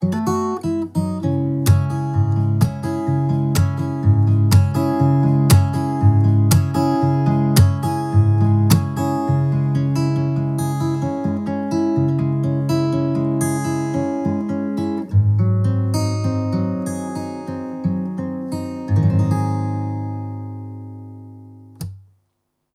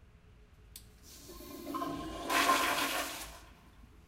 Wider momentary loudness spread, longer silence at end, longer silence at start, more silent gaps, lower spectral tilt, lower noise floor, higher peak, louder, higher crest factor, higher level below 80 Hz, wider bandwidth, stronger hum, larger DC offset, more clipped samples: second, 11 LU vs 25 LU; first, 0.75 s vs 0.05 s; second, 0 s vs 0.25 s; neither; first, -7.5 dB/octave vs -2 dB/octave; first, -72 dBFS vs -59 dBFS; first, -2 dBFS vs -14 dBFS; first, -19 LUFS vs -33 LUFS; second, 16 dB vs 22 dB; first, -44 dBFS vs -58 dBFS; about the same, 15 kHz vs 16 kHz; neither; neither; neither